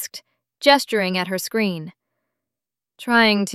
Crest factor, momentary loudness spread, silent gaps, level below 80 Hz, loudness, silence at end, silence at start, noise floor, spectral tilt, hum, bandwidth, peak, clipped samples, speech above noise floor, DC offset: 20 dB; 18 LU; none; -68 dBFS; -19 LUFS; 0 s; 0 s; -88 dBFS; -4 dB/octave; none; 14 kHz; -2 dBFS; under 0.1%; 69 dB; under 0.1%